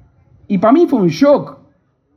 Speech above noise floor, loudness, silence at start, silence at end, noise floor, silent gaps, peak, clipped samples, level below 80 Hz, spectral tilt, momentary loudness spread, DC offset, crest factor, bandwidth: 46 dB; -13 LUFS; 0.5 s; 0.6 s; -57 dBFS; none; 0 dBFS; under 0.1%; -58 dBFS; -7.5 dB/octave; 9 LU; under 0.1%; 14 dB; 13 kHz